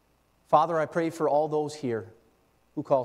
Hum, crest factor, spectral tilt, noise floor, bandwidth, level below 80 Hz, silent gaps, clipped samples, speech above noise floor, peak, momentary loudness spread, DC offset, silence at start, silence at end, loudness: none; 20 dB; -6.5 dB/octave; -66 dBFS; 13.5 kHz; -72 dBFS; none; under 0.1%; 40 dB; -8 dBFS; 12 LU; under 0.1%; 0.5 s; 0 s; -27 LUFS